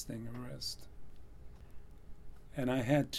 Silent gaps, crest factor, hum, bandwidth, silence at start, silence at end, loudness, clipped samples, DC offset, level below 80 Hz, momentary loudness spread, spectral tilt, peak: none; 20 dB; none; 15 kHz; 0 s; 0 s; -38 LUFS; under 0.1%; under 0.1%; -54 dBFS; 26 LU; -5.5 dB/octave; -18 dBFS